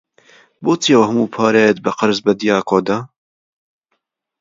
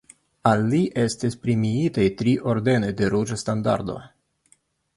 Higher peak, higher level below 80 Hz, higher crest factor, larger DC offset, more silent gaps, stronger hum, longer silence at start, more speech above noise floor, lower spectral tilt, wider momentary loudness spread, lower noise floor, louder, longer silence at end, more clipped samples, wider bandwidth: first, 0 dBFS vs -4 dBFS; second, -60 dBFS vs -52 dBFS; about the same, 16 dB vs 20 dB; neither; neither; neither; first, 0.6 s vs 0.45 s; first, 57 dB vs 41 dB; second, -5 dB/octave vs -6.5 dB/octave; first, 8 LU vs 5 LU; first, -71 dBFS vs -63 dBFS; first, -15 LUFS vs -23 LUFS; first, 1.35 s vs 0.9 s; neither; second, 7.6 kHz vs 11.5 kHz